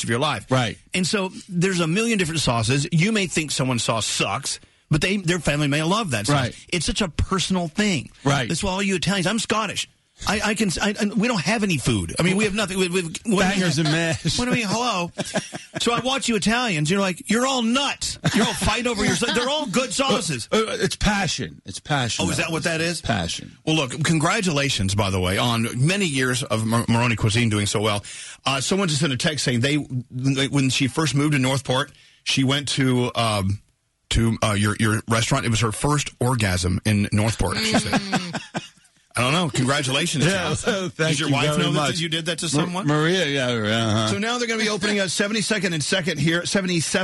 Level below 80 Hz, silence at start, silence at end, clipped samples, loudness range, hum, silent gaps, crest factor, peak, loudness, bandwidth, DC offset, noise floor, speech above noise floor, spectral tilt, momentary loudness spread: -42 dBFS; 0 s; 0 s; under 0.1%; 2 LU; none; none; 14 dB; -8 dBFS; -21 LUFS; 12 kHz; under 0.1%; -51 dBFS; 29 dB; -4 dB/octave; 5 LU